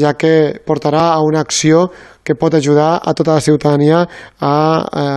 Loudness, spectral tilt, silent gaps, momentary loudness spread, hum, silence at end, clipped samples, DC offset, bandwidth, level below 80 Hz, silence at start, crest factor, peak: -13 LUFS; -5.5 dB/octave; none; 7 LU; none; 0 s; under 0.1%; under 0.1%; 12 kHz; -50 dBFS; 0 s; 12 dB; 0 dBFS